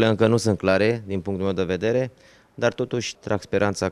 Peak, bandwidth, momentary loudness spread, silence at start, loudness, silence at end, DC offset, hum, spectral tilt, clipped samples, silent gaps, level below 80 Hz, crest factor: -6 dBFS; 13 kHz; 8 LU; 0 s; -23 LUFS; 0 s; under 0.1%; none; -5.5 dB/octave; under 0.1%; none; -56 dBFS; 16 dB